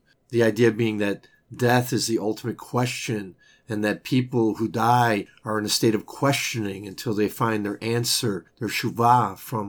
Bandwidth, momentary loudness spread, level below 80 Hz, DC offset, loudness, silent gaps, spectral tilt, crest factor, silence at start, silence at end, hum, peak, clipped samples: over 20 kHz; 10 LU; -66 dBFS; under 0.1%; -24 LUFS; none; -5 dB/octave; 18 dB; 0.3 s; 0 s; none; -4 dBFS; under 0.1%